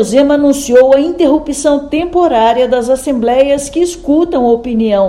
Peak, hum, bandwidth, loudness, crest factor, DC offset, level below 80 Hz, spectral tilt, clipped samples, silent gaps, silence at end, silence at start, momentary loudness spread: 0 dBFS; none; 13.5 kHz; -11 LUFS; 10 dB; under 0.1%; -36 dBFS; -4.5 dB/octave; 0.9%; none; 0 s; 0 s; 5 LU